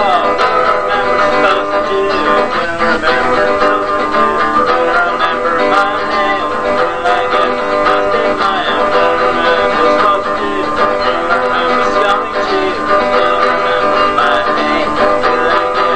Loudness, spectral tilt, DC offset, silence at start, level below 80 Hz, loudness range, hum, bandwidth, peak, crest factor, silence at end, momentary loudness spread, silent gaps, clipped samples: -12 LUFS; -4 dB/octave; 3%; 0 s; -38 dBFS; 1 LU; none; 9.4 kHz; 0 dBFS; 12 dB; 0 s; 3 LU; none; under 0.1%